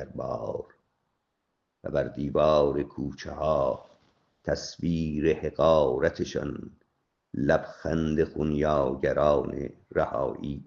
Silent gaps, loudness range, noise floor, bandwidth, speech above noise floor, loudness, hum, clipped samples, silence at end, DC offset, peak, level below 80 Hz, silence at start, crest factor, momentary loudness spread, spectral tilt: none; 2 LU; -79 dBFS; 7.2 kHz; 52 dB; -27 LUFS; none; under 0.1%; 0.05 s; under 0.1%; -8 dBFS; -48 dBFS; 0 s; 20 dB; 14 LU; -7 dB/octave